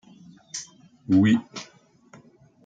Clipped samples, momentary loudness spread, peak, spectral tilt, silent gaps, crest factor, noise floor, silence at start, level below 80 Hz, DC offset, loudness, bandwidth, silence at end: under 0.1%; 26 LU; -8 dBFS; -5.5 dB/octave; none; 18 dB; -55 dBFS; 0.55 s; -68 dBFS; under 0.1%; -23 LUFS; 9 kHz; 1 s